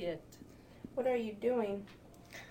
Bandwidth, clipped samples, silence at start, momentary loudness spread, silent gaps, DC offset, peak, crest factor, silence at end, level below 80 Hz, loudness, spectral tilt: 16.5 kHz; under 0.1%; 0 s; 21 LU; none; under 0.1%; -22 dBFS; 16 dB; 0 s; -66 dBFS; -37 LUFS; -6 dB/octave